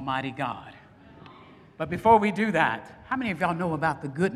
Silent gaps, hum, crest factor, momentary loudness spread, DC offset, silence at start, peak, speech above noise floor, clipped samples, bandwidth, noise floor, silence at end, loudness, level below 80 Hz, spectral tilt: none; none; 20 dB; 13 LU; under 0.1%; 0 s; -6 dBFS; 25 dB; under 0.1%; 13.5 kHz; -51 dBFS; 0 s; -26 LUFS; -58 dBFS; -6.5 dB/octave